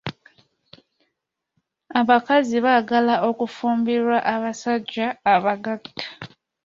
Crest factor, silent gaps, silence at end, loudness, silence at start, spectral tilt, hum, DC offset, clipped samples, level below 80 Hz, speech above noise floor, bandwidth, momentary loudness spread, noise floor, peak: 20 dB; none; 0.4 s; -21 LUFS; 0.05 s; -5 dB/octave; none; under 0.1%; under 0.1%; -66 dBFS; 59 dB; 7.6 kHz; 15 LU; -79 dBFS; -2 dBFS